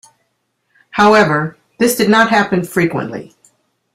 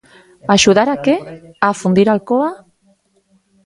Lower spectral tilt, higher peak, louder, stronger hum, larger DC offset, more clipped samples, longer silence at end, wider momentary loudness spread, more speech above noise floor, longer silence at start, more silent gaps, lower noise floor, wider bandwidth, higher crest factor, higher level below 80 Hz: about the same, -5 dB/octave vs -4.5 dB/octave; about the same, 0 dBFS vs 0 dBFS; about the same, -13 LUFS vs -14 LUFS; neither; neither; neither; second, 0.7 s vs 1.1 s; first, 15 LU vs 11 LU; first, 54 dB vs 44 dB; first, 0.95 s vs 0.45 s; neither; first, -67 dBFS vs -58 dBFS; first, 16 kHz vs 11.5 kHz; about the same, 14 dB vs 16 dB; about the same, -52 dBFS vs -52 dBFS